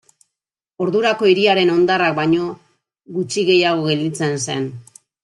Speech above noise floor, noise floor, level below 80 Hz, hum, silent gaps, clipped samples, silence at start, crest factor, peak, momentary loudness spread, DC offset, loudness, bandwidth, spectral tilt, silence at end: 68 dB; -85 dBFS; -62 dBFS; none; none; under 0.1%; 0.8 s; 16 dB; -2 dBFS; 11 LU; under 0.1%; -17 LUFS; 11.5 kHz; -4.5 dB/octave; 0.45 s